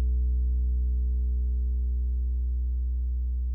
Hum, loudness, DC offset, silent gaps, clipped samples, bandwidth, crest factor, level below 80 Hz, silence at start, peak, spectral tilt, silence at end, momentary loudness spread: 60 Hz at -70 dBFS; -29 LUFS; under 0.1%; none; under 0.1%; 0.5 kHz; 6 dB; -26 dBFS; 0 s; -20 dBFS; -12.5 dB/octave; 0 s; 3 LU